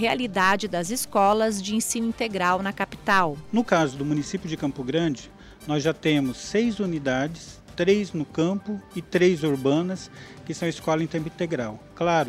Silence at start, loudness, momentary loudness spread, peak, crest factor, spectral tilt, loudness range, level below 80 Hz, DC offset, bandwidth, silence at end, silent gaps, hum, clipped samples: 0 s; -25 LUFS; 10 LU; -6 dBFS; 20 dB; -5 dB/octave; 3 LU; -54 dBFS; under 0.1%; 16 kHz; 0 s; none; none; under 0.1%